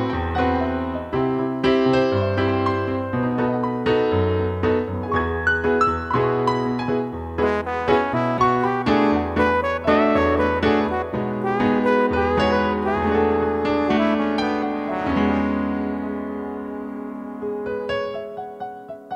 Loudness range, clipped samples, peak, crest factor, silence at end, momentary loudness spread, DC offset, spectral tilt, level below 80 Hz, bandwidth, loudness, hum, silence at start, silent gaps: 5 LU; under 0.1%; -4 dBFS; 16 dB; 0 s; 10 LU; under 0.1%; -7.5 dB/octave; -40 dBFS; 9 kHz; -21 LUFS; none; 0 s; none